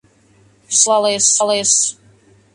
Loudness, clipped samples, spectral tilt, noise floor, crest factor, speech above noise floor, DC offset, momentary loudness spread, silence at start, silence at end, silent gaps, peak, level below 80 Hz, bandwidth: -13 LUFS; under 0.1%; -0.5 dB/octave; -52 dBFS; 18 dB; 37 dB; under 0.1%; 4 LU; 0.7 s; 0.6 s; none; 0 dBFS; -64 dBFS; 11.5 kHz